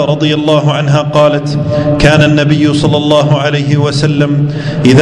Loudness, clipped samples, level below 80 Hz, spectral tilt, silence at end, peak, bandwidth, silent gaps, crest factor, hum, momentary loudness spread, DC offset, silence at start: -10 LUFS; 2%; -32 dBFS; -6.5 dB/octave; 0 s; 0 dBFS; 10.5 kHz; none; 8 dB; none; 5 LU; under 0.1%; 0 s